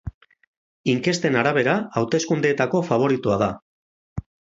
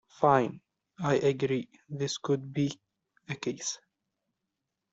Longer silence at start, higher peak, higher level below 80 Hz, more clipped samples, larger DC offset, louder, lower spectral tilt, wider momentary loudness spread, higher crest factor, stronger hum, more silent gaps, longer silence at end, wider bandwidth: second, 0.05 s vs 0.2 s; first, -2 dBFS vs -10 dBFS; first, -48 dBFS vs -70 dBFS; neither; neither; first, -21 LUFS vs -30 LUFS; about the same, -5.5 dB/octave vs -5 dB/octave; about the same, 17 LU vs 15 LU; about the same, 20 dB vs 22 dB; neither; first, 0.14-0.21 s, 0.47-0.84 s, 3.62-4.16 s vs none; second, 0.4 s vs 1.15 s; about the same, 8 kHz vs 8 kHz